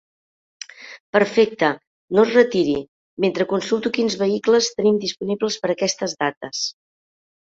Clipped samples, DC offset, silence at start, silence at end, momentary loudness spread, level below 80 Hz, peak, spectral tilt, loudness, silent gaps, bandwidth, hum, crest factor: under 0.1%; under 0.1%; 0.8 s; 0.7 s; 15 LU; -62 dBFS; -2 dBFS; -4 dB/octave; -20 LUFS; 1.00-1.13 s, 1.87-2.08 s, 2.88-3.17 s, 6.37-6.41 s; 7.8 kHz; none; 18 dB